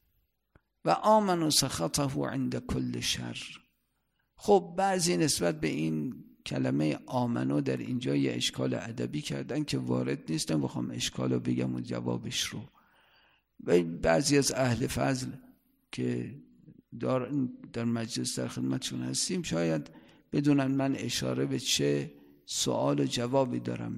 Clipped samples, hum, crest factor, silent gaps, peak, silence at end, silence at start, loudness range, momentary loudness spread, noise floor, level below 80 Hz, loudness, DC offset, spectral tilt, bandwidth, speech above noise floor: under 0.1%; none; 20 dB; none; -12 dBFS; 0 s; 0.85 s; 4 LU; 10 LU; -78 dBFS; -58 dBFS; -30 LUFS; under 0.1%; -4.5 dB/octave; 15.5 kHz; 48 dB